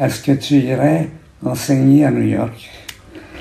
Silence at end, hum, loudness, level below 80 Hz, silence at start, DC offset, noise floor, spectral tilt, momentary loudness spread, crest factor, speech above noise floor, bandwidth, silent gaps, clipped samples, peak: 0 s; none; -15 LUFS; -48 dBFS; 0 s; under 0.1%; -37 dBFS; -6.5 dB/octave; 22 LU; 14 dB; 22 dB; 15.5 kHz; none; under 0.1%; -2 dBFS